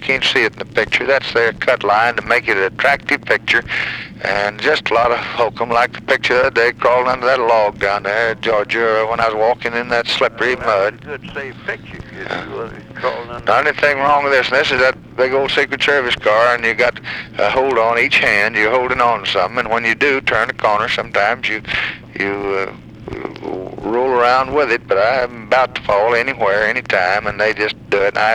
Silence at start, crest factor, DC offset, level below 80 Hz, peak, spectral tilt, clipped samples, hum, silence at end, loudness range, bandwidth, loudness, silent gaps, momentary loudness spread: 0 s; 16 dB; 0.1%; -46 dBFS; 0 dBFS; -4 dB/octave; under 0.1%; none; 0 s; 5 LU; 13.5 kHz; -15 LUFS; none; 11 LU